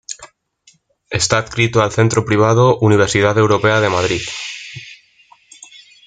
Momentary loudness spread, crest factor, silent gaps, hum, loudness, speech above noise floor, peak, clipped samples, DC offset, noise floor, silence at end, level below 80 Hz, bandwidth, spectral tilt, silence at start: 17 LU; 16 dB; none; none; -14 LUFS; 40 dB; 0 dBFS; under 0.1%; under 0.1%; -54 dBFS; 1.1 s; -46 dBFS; 9.4 kHz; -5 dB/octave; 0.1 s